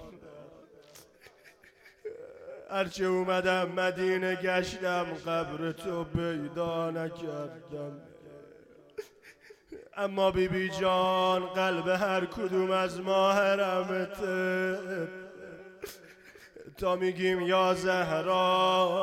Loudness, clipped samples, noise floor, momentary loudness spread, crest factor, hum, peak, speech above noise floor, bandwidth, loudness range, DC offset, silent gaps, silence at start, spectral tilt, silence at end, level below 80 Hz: -29 LUFS; under 0.1%; -59 dBFS; 20 LU; 16 dB; none; -14 dBFS; 30 dB; 16 kHz; 8 LU; under 0.1%; none; 0 s; -5 dB/octave; 0 s; -60 dBFS